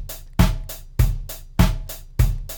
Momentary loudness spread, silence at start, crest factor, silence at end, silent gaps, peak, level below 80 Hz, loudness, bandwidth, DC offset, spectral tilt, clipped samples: 12 LU; 0 s; 18 dB; 0 s; none; -2 dBFS; -24 dBFS; -23 LUFS; 19.5 kHz; under 0.1%; -6 dB/octave; under 0.1%